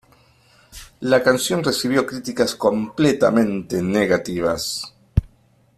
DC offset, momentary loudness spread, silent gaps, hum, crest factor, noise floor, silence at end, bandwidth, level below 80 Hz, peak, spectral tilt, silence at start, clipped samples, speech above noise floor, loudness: under 0.1%; 8 LU; none; none; 18 dB; -57 dBFS; 0.5 s; 15 kHz; -40 dBFS; -2 dBFS; -5 dB/octave; 0.75 s; under 0.1%; 38 dB; -20 LUFS